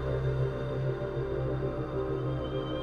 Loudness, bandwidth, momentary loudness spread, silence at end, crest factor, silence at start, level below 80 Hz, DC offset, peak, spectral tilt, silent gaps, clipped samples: -33 LUFS; 6 kHz; 3 LU; 0 s; 12 dB; 0 s; -42 dBFS; under 0.1%; -18 dBFS; -9 dB/octave; none; under 0.1%